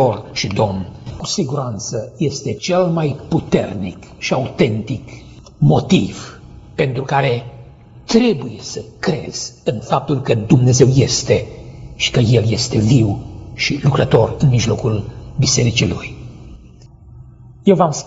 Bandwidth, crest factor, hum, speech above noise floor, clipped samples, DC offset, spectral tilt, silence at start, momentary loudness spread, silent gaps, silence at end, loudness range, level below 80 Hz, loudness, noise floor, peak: 8 kHz; 16 dB; none; 25 dB; under 0.1%; under 0.1%; -5.5 dB/octave; 0 s; 15 LU; none; 0 s; 5 LU; -40 dBFS; -17 LUFS; -41 dBFS; 0 dBFS